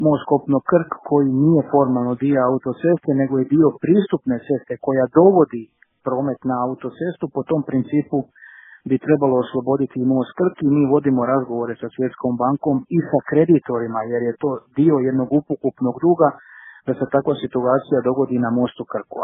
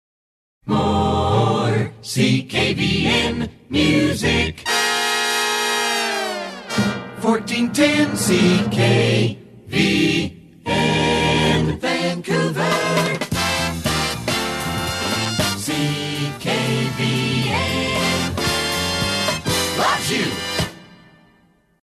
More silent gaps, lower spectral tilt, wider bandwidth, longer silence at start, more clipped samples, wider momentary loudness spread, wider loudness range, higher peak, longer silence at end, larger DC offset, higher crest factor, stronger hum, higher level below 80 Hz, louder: neither; first, -13 dB/octave vs -4 dB/octave; second, 3.8 kHz vs 14 kHz; second, 0 s vs 0.65 s; neither; about the same, 9 LU vs 7 LU; about the same, 4 LU vs 3 LU; first, 0 dBFS vs -4 dBFS; second, 0 s vs 0.95 s; neither; about the same, 18 dB vs 16 dB; neither; second, -60 dBFS vs -42 dBFS; about the same, -19 LUFS vs -19 LUFS